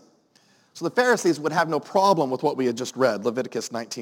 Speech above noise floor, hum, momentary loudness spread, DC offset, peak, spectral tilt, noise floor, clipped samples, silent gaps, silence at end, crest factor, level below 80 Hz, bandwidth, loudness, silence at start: 37 dB; none; 9 LU; under 0.1%; -6 dBFS; -4.5 dB/octave; -60 dBFS; under 0.1%; none; 0 s; 18 dB; -78 dBFS; 17 kHz; -23 LUFS; 0.75 s